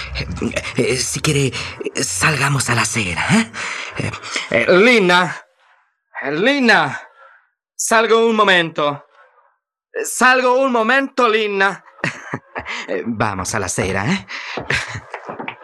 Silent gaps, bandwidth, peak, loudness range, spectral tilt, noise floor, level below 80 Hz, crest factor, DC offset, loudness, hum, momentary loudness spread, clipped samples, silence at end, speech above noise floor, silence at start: none; 15 kHz; 0 dBFS; 5 LU; -3.5 dB/octave; -63 dBFS; -46 dBFS; 18 dB; under 0.1%; -16 LUFS; none; 15 LU; under 0.1%; 0.1 s; 47 dB; 0 s